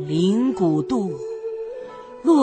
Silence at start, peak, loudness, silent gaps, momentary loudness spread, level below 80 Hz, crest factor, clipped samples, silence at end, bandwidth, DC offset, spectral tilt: 0 s; -6 dBFS; -22 LUFS; none; 14 LU; -60 dBFS; 16 dB; under 0.1%; 0 s; 9 kHz; under 0.1%; -7.5 dB/octave